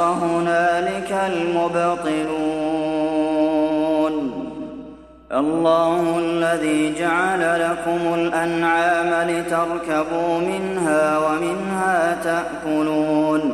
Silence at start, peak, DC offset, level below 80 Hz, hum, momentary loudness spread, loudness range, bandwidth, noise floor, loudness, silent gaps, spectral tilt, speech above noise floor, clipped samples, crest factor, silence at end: 0 s; -6 dBFS; under 0.1%; -52 dBFS; none; 5 LU; 2 LU; 13.5 kHz; -40 dBFS; -20 LUFS; none; -5.5 dB/octave; 21 dB; under 0.1%; 14 dB; 0 s